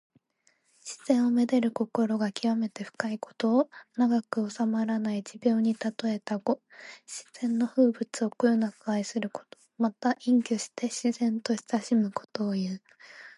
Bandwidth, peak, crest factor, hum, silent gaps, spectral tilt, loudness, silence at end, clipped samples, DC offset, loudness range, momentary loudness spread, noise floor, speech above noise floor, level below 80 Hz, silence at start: 11.5 kHz; -8 dBFS; 20 dB; none; none; -5.5 dB/octave; -28 LUFS; 0.05 s; under 0.1%; under 0.1%; 2 LU; 10 LU; -70 dBFS; 42 dB; -80 dBFS; 0.85 s